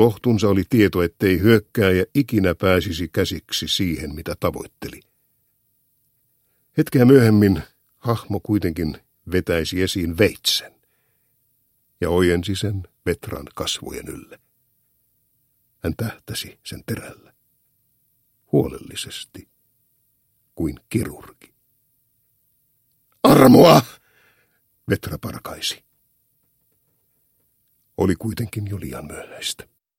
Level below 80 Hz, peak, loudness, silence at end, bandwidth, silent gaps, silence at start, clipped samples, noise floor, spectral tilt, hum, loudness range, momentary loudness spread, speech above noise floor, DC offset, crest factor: -46 dBFS; 0 dBFS; -20 LUFS; 0.45 s; 16.5 kHz; none; 0 s; under 0.1%; -66 dBFS; -5.5 dB/octave; none; 16 LU; 19 LU; 47 dB; under 0.1%; 22 dB